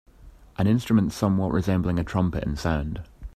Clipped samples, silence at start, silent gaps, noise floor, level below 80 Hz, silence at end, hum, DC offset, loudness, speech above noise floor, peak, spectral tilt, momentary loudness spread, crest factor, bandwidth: under 0.1%; 0.2 s; none; -49 dBFS; -40 dBFS; 0.05 s; none; under 0.1%; -25 LUFS; 26 dB; -6 dBFS; -7.5 dB/octave; 9 LU; 18 dB; 14.5 kHz